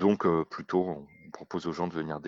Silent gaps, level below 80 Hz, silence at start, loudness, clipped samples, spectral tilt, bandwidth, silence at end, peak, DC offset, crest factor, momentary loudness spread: none; -64 dBFS; 0 s; -31 LUFS; under 0.1%; -7.5 dB/octave; 7.6 kHz; 0 s; -10 dBFS; under 0.1%; 20 dB; 16 LU